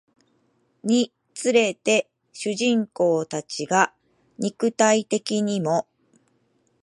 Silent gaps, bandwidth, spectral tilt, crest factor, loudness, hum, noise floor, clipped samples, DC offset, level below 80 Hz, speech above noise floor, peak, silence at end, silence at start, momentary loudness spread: none; 11.5 kHz; -4 dB/octave; 20 dB; -23 LUFS; none; -66 dBFS; under 0.1%; under 0.1%; -76 dBFS; 45 dB; -4 dBFS; 1 s; 0.85 s; 10 LU